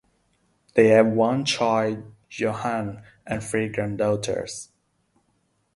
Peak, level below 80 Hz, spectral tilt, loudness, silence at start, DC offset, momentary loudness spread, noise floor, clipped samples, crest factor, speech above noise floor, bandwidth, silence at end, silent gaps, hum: -4 dBFS; -58 dBFS; -5 dB/octave; -23 LUFS; 0.75 s; under 0.1%; 18 LU; -69 dBFS; under 0.1%; 22 dB; 46 dB; 11.5 kHz; 1.1 s; none; none